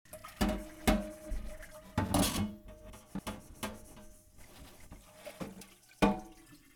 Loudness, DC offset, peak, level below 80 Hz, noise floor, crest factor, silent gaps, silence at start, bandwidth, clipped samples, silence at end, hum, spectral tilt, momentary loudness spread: -36 LUFS; under 0.1%; -14 dBFS; -46 dBFS; -57 dBFS; 24 dB; none; 0.1 s; over 20 kHz; under 0.1%; 0.2 s; none; -4.5 dB/octave; 23 LU